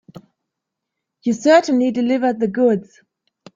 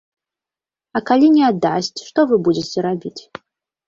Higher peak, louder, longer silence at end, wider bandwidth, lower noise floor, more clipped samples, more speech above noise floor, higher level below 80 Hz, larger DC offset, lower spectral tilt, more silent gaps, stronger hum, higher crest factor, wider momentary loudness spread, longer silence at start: about the same, -2 dBFS vs -2 dBFS; about the same, -17 LUFS vs -17 LUFS; about the same, 0.75 s vs 0.65 s; about the same, 7.6 kHz vs 7.6 kHz; second, -81 dBFS vs -90 dBFS; neither; second, 64 dB vs 73 dB; about the same, -64 dBFS vs -60 dBFS; neither; about the same, -5.5 dB/octave vs -5.5 dB/octave; neither; neither; about the same, 18 dB vs 16 dB; second, 10 LU vs 13 LU; first, 1.25 s vs 0.95 s